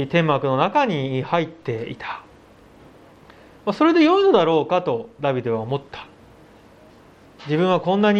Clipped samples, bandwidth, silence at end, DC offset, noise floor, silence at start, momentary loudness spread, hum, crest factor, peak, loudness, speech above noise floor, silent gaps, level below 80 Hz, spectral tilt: under 0.1%; 8.2 kHz; 0 s; under 0.1%; -49 dBFS; 0 s; 16 LU; none; 18 dB; -4 dBFS; -20 LUFS; 29 dB; none; -60 dBFS; -7.5 dB/octave